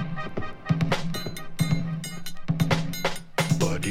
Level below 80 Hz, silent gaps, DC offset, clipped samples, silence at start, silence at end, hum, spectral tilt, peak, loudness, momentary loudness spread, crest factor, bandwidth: -42 dBFS; none; under 0.1%; under 0.1%; 0 s; 0 s; none; -5.5 dB/octave; -8 dBFS; -28 LUFS; 10 LU; 18 dB; 16 kHz